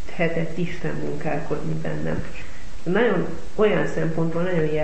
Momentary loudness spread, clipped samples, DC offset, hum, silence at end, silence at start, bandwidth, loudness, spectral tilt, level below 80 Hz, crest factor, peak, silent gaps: 10 LU; under 0.1%; 8%; none; 0 s; 0 s; 8.6 kHz; -25 LUFS; -7 dB/octave; -42 dBFS; 16 dB; -8 dBFS; none